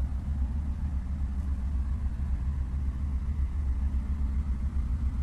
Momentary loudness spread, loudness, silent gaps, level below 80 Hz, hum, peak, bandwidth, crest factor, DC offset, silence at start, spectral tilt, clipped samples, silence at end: 2 LU; -32 LUFS; none; -30 dBFS; none; -18 dBFS; 3.1 kHz; 12 dB; under 0.1%; 0 s; -9 dB/octave; under 0.1%; 0 s